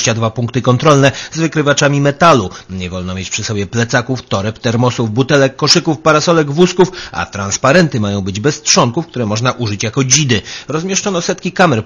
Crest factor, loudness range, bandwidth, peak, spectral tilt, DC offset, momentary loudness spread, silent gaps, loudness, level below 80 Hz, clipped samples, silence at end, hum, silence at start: 12 dB; 3 LU; 11 kHz; 0 dBFS; -4 dB/octave; under 0.1%; 9 LU; none; -13 LUFS; -44 dBFS; 0.3%; 0 s; none; 0 s